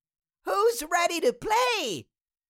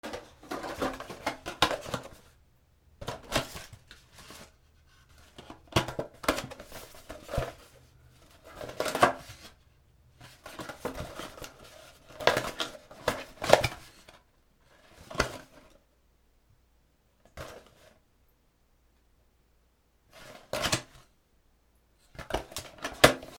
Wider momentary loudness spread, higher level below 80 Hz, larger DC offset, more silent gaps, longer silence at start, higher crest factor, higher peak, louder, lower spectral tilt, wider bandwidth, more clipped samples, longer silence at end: second, 10 LU vs 25 LU; second, -60 dBFS vs -52 dBFS; neither; neither; first, 0.45 s vs 0.05 s; second, 16 dB vs 36 dB; second, -12 dBFS vs 0 dBFS; first, -26 LUFS vs -31 LUFS; second, -2 dB/octave vs -3.5 dB/octave; second, 17 kHz vs over 20 kHz; neither; first, 0.5 s vs 0 s